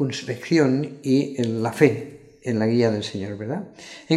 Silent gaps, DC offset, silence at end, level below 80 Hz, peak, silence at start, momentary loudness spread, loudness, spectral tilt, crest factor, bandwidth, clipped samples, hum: none; under 0.1%; 0 s; -66 dBFS; -2 dBFS; 0 s; 14 LU; -23 LUFS; -6.5 dB/octave; 20 dB; 13.5 kHz; under 0.1%; none